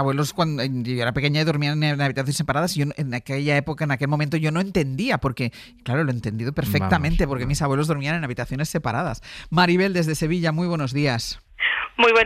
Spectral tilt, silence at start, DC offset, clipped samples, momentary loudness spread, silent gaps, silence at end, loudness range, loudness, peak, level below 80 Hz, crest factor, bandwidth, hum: -5.5 dB/octave; 0 s; under 0.1%; under 0.1%; 7 LU; none; 0 s; 1 LU; -23 LUFS; -6 dBFS; -38 dBFS; 16 dB; 15 kHz; none